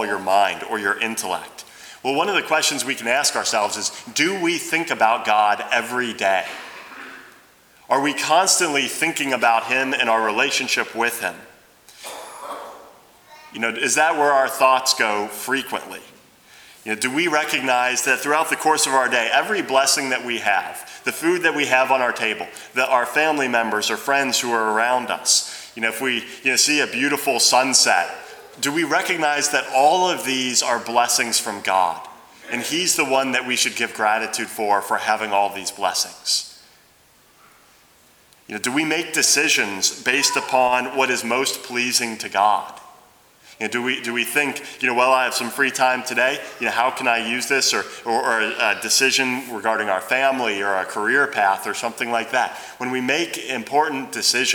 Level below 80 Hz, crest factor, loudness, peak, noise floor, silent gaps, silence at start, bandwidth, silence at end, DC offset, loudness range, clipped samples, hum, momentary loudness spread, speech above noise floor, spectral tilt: -70 dBFS; 20 dB; -19 LUFS; 0 dBFS; -54 dBFS; none; 0 s; over 20 kHz; 0 s; under 0.1%; 4 LU; under 0.1%; none; 10 LU; 34 dB; -1 dB/octave